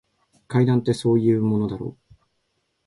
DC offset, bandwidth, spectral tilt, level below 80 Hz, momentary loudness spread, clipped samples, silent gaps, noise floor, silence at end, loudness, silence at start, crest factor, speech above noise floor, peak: under 0.1%; 11.5 kHz; -8 dB/octave; -56 dBFS; 11 LU; under 0.1%; none; -72 dBFS; 0.95 s; -21 LUFS; 0.5 s; 16 dB; 52 dB; -6 dBFS